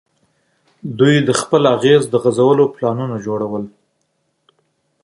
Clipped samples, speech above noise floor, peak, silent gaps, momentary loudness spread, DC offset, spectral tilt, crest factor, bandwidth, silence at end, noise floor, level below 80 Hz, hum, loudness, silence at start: under 0.1%; 53 dB; 0 dBFS; none; 14 LU; under 0.1%; -5.5 dB/octave; 16 dB; 11.5 kHz; 1.35 s; -67 dBFS; -58 dBFS; none; -15 LUFS; 0.85 s